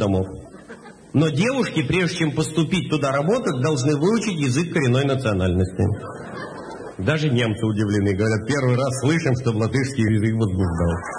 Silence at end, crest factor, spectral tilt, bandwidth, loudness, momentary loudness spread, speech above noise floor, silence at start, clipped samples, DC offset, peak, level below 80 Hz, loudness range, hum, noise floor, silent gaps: 0 s; 14 dB; -6 dB/octave; 10.5 kHz; -21 LUFS; 13 LU; 21 dB; 0 s; under 0.1%; under 0.1%; -6 dBFS; -44 dBFS; 2 LU; none; -42 dBFS; none